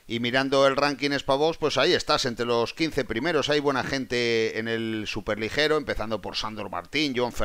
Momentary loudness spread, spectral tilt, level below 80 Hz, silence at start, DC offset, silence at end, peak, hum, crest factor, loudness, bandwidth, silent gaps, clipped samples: 8 LU; -4 dB/octave; -48 dBFS; 0.05 s; under 0.1%; 0 s; -6 dBFS; none; 20 dB; -25 LUFS; 16 kHz; none; under 0.1%